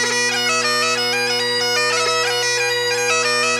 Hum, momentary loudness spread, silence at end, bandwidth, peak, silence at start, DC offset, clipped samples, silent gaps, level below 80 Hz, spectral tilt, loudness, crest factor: none; 1 LU; 0 s; 16 kHz; -6 dBFS; 0 s; under 0.1%; under 0.1%; none; -66 dBFS; -0.5 dB/octave; -16 LUFS; 12 dB